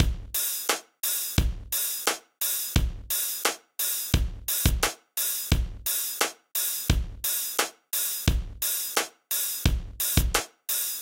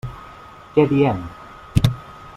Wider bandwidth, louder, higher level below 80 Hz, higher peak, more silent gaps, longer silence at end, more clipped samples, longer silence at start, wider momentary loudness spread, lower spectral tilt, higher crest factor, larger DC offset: about the same, 17 kHz vs 15.5 kHz; second, -27 LUFS vs -20 LUFS; about the same, -34 dBFS vs -38 dBFS; second, -6 dBFS vs -2 dBFS; neither; about the same, 0 s vs 0.05 s; neither; about the same, 0 s vs 0.05 s; second, 4 LU vs 23 LU; second, -2.5 dB/octave vs -7.5 dB/octave; about the same, 22 dB vs 20 dB; neither